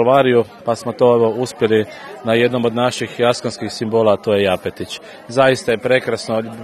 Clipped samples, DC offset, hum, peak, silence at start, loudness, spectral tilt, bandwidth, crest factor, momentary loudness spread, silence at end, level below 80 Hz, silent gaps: under 0.1%; under 0.1%; none; 0 dBFS; 0 s; -17 LUFS; -5.5 dB/octave; 13.5 kHz; 16 dB; 11 LU; 0 s; -58 dBFS; none